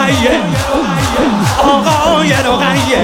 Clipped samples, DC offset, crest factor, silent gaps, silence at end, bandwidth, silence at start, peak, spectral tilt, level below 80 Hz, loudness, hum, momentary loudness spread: under 0.1%; under 0.1%; 10 dB; none; 0 s; 17.5 kHz; 0 s; 0 dBFS; -4.5 dB/octave; -30 dBFS; -11 LUFS; none; 3 LU